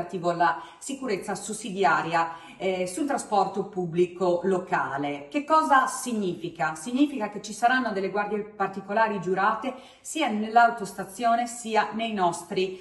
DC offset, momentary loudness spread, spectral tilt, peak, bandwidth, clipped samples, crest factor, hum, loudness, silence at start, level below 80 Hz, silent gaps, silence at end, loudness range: under 0.1%; 10 LU; -4.5 dB/octave; -6 dBFS; 14.5 kHz; under 0.1%; 20 dB; none; -26 LUFS; 0 s; -68 dBFS; none; 0 s; 2 LU